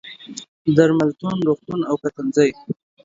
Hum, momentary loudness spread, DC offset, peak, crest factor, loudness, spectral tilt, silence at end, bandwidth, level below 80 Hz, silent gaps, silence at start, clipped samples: none; 17 LU; under 0.1%; 0 dBFS; 20 dB; -19 LUFS; -6.5 dB/octave; 0.3 s; 7.8 kHz; -60 dBFS; 0.48-0.65 s; 0.05 s; under 0.1%